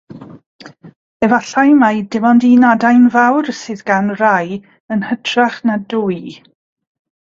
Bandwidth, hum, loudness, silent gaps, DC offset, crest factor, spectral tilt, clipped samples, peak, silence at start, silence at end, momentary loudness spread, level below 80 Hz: 7.4 kHz; none; -13 LUFS; 0.46-0.59 s, 0.96-1.20 s, 4.80-4.88 s; under 0.1%; 14 dB; -5.5 dB/octave; under 0.1%; 0 dBFS; 0.1 s; 0.9 s; 13 LU; -58 dBFS